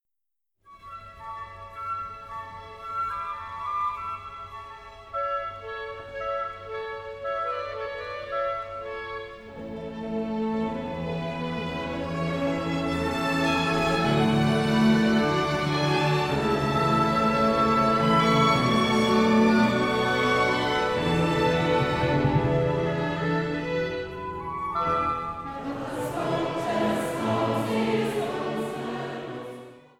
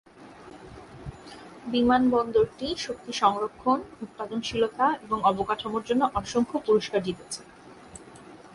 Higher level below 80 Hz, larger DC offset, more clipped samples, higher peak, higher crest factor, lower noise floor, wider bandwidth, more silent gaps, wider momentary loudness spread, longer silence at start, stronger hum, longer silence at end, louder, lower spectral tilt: first, -48 dBFS vs -54 dBFS; neither; neither; about the same, -10 dBFS vs -8 dBFS; about the same, 16 dB vs 18 dB; first, -87 dBFS vs -48 dBFS; first, 15.5 kHz vs 11.5 kHz; neither; second, 16 LU vs 23 LU; first, 0.7 s vs 0.2 s; neither; first, 0.2 s vs 0 s; about the same, -25 LUFS vs -26 LUFS; about the same, -6 dB/octave vs -5 dB/octave